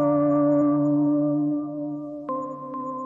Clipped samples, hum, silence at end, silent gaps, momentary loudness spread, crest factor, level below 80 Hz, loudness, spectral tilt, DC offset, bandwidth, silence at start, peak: under 0.1%; none; 0 s; none; 12 LU; 12 dB; -68 dBFS; -24 LUFS; -12 dB/octave; under 0.1%; 2.4 kHz; 0 s; -12 dBFS